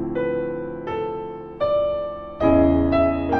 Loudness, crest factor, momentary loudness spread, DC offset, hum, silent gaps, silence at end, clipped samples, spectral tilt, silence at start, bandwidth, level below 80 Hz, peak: -22 LUFS; 16 dB; 13 LU; under 0.1%; none; none; 0 s; under 0.1%; -9.5 dB/octave; 0 s; 5 kHz; -38 dBFS; -6 dBFS